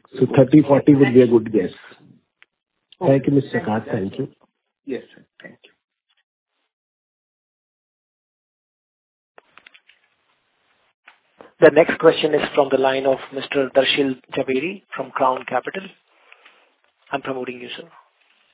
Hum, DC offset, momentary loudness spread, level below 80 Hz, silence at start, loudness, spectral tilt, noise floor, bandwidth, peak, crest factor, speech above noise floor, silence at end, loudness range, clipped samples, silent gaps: none; under 0.1%; 18 LU; -60 dBFS; 0.15 s; -18 LUFS; -10.5 dB/octave; -66 dBFS; 4 kHz; 0 dBFS; 22 dB; 48 dB; 0.75 s; 14 LU; under 0.1%; 6.23-6.46 s, 6.73-9.35 s, 10.94-11.03 s